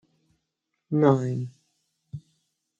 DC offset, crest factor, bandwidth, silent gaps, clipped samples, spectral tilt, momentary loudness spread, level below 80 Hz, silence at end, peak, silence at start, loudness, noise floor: under 0.1%; 22 dB; 7.8 kHz; none; under 0.1%; -9 dB/octave; 23 LU; -70 dBFS; 0.6 s; -6 dBFS; 0.9 s; -24 LUFS; -81 dBFS